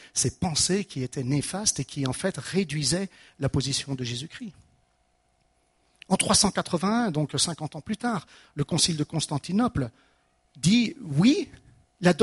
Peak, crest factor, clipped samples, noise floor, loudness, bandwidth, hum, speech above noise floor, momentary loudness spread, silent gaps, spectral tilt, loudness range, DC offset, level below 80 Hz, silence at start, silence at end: -4 dBFS; 22 dB; under 0.1%; -69 dBFS; -26 LUFS; 11.5 kHz; none; 42 dB; 12 LU; none; -4 dB/octave; 5 LU; under 0.1%; -52 dBFS; 0 s; 0 s